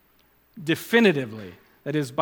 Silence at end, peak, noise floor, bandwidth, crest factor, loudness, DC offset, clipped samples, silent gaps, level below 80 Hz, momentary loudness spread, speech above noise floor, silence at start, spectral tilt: 0 s; -6 dBFS; -61 dBFS; 19.5 kHz; 20 dB; -23 LUFS; under 0.1%; under 0.1%; none; -70 dBFS; 20 LU; 38 dB; 0.55 s; -5.5 dB/octave